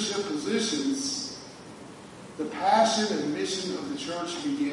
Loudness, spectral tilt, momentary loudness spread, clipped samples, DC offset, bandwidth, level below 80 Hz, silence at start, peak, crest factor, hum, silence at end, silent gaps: -28 LUFS; -3 dB/octave; 22 LU; under 0.1%; under 0.1%; 11.5 kHz; -68 dBFS; 0 s; -10 dBFS; 20 dB; none; 0 s; none